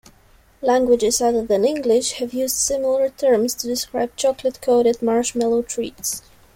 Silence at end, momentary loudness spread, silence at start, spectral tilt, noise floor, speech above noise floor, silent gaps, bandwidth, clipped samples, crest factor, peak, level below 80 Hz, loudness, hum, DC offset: 0.35 s; 8 LU; 0.6 s; -3 dB/octave; -53 dBFS; 33 dB; none; 16.5 kHz; under 0.1%; 14 dB; -6 dBFS; -52 dBFS; -20 LUFS; none; under 0.1%